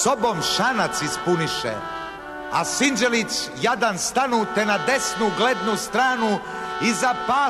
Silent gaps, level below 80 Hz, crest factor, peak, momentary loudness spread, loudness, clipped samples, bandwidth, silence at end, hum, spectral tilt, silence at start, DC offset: none; -54 dBFS; 14 dB; -8 dBFS; 7 LU; -21 LUFS; under 0.1%; 13.5 kHz; 0 s; none; -3 dB/octave; 0 s; under 0.1%